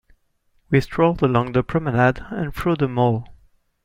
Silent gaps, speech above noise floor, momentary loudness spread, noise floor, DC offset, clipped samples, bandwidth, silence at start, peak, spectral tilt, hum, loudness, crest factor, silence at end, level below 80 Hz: none; 44 dB; 7 LU; -64 dBFS; under 0.1%; under 0.1%; 15.5 kHz; 0.7 s; -2 dBFS; -8.5 dB/octave; none; -20 LUFS; 18 dB; 0.5 s; -42 dBFS